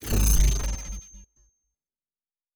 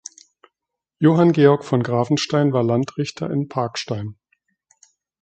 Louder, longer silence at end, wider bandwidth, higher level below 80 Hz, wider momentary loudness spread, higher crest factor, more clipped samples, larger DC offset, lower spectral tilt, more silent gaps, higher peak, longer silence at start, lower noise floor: second, -25 LUFS vs -19 LUFS; first, 1.35 s vs 1.1 s; first, over 20 kHz vs 8.8 kHz; first, -28 dBFS vs -60 dBFS; first, 17 LU vs 13 LU; about the same, 18 dB vs 20 dB; neither; neither; second, -4 dB/octave vs -6.5 dB/octave; neither; second, -8 dBFS vs -2 dBFS; second, 0 s vs 1 s; first, under -90 dBFS vs -84 dBFS